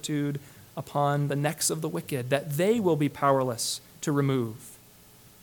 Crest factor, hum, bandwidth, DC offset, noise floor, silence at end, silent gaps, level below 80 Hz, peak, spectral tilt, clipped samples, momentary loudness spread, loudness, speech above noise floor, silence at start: 20 dB; none; 19 kHz; under 0.1%; -54 dBFS; 0.65 s; none; -66 dBFS; -8 dBFS; -5 dB/octave; under 0.1%; 13 LU; -27 LUFS; 27 dB; 0.05 s